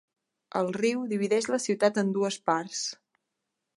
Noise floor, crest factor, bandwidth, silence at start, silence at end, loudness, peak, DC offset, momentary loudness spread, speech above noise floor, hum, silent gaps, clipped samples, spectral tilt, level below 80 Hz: -84 dBFS; 22 dB; 11.5 kHz; 0.55 s; 0.85 s; -28 LUFS; -8 dBFS; under 0.1%; 8 LU; 56 dB; none; none; under 0.1%; -4 dB/octave; -80 dBFS